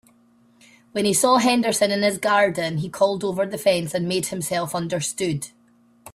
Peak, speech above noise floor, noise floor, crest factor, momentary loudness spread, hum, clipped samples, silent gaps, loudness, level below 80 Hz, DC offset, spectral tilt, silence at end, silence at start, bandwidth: -6 dBFS; 36 dB; -57 dBFS; 18 dB; 9 LU; none; under 0.1%; none; -21 LUFS; -62 dBFS; under 0.1%; -4 dB/octave; 0.05 s; 0.95 s; 15.5 kHz